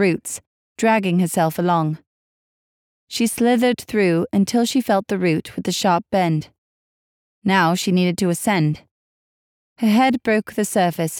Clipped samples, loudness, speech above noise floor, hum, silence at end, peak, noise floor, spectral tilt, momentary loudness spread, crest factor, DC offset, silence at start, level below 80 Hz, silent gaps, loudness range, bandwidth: under 0.1%; -19 LUFS; over 72 dB; none; 0 s; -6 dBFS; under -90 dBFS; -5.5 dB/octave; 8 LU; 14 dB; under 0.1%; 0 s; -60 dBFS; 0.47-0.75 s, 2.07-3.07 s, 6.58-7.42 s, 8.91-9.76 s; 2 LU; 18.5 kHz